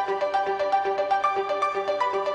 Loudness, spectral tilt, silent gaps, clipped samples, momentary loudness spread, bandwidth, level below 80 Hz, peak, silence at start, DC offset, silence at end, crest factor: -25 LUFS; -3.5 dB/octave; none; under 0.1%; 2 LU; 9.6 kHz; -66 dBFS; -12 dBFS; 0 s; under 0.1%; 0 s; 12 dB